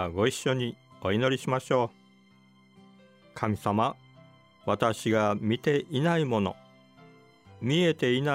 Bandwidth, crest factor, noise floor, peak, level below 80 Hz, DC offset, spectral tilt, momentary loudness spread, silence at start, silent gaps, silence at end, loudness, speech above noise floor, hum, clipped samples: 16 kHz; 18 dB; -59 dBFS; -10 dBFS; -64 dBFS; under 0.1%; -6 dB/octave; 10 LU; 0 s; none; 0 s; -28 LUFS; 32 dB; none; under 0.1%